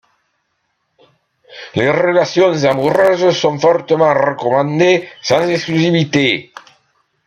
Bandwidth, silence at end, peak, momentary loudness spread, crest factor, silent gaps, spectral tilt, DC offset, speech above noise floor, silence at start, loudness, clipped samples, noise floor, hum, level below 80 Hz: 11.5 kHz; 0.85 s; 0 dBFS; 4 LU; 14 dB; none; -5.5 dB/octave; under 0.1%; 54 dB; 1.5 s; -14 LUFS; under 0.1%; -67 dBFS; none; -58 dBFS